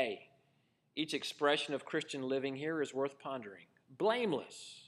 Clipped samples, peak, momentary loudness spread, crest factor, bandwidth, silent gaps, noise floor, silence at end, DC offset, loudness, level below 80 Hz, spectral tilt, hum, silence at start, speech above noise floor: under 0.1%; -16 dBFS; 13 LU; 22 dB; 13 kHz; none; -75 dBFS; 0 s; under 0.1%; -37 LUFS; under -90 dBFS; -4 dB/octave; none; 0 s; 38 dB